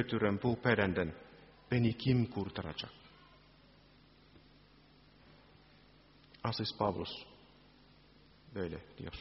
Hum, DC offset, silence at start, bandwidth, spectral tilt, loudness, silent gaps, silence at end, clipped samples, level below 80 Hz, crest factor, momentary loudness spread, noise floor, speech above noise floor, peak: none; under 0.1%; 0 s; 5.8 kHz; -5 dB/octave; -36 LUFS; none; 0 s; under 0.1%; -62 dBFS; 26 dB; 17 LU; -63 dBFS; 28 dB; -12 dBFS